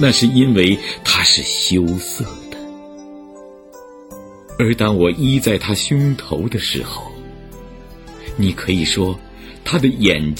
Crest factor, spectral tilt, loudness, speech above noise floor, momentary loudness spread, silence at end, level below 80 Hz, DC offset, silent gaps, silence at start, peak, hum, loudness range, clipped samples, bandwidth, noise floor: 18 dB; -4.5 dB/octave; -16 LUFS; 23 dB; 25 LU; 0 s; -38 dBFS; under 0.1%; none; 0 s; 0 dBFS; none; 6 LU; under 0.1%; 17 kHz; -39 dBFS